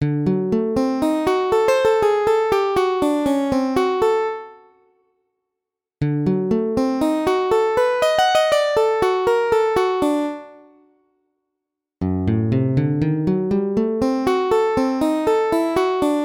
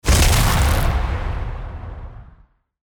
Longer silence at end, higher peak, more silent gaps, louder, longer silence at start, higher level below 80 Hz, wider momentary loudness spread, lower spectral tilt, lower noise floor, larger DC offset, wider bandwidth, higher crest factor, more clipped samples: second, 0 s vs 0.55 s; about the same, -6 dBFS vs -4 dBFS; neither; about the same, -19 LUFS vs -19 LUFS; about the same, 0 s vs 0.05 s; second, -48 dBFS vs -22 dBFS; second, 4 LU vs 20 LU; first, -6.5 dB/octave vs -4 dB/octave; first, -84 dBFS vs -52 dBFS; neither; second, 18 kHz vs over 20 kHz; about the same, 14 dB vs 14 dB; neither